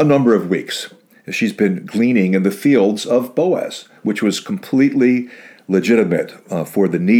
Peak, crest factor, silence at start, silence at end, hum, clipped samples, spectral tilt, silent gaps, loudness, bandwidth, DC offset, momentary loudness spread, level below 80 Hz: -2 dBFS; 14 dB; 0 s; 0 s; none; under 0.1%; -6 dB/octave; none; -17 LUFS; 18 kHz; under 0.1%; 11 LU; -66 dBFS